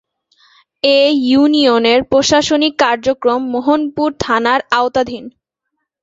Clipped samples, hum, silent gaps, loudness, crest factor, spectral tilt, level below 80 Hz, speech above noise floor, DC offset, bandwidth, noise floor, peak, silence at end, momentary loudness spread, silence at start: under 0.1%; none; none; -13 LUFS; 14 dB; -3.5 dB/octave; -48 dBFS; 61 dB; under 0.1%; 8 kHz; -74 dBFS; 0 dBFS; 0.75 s; 7 LU; 0.85 s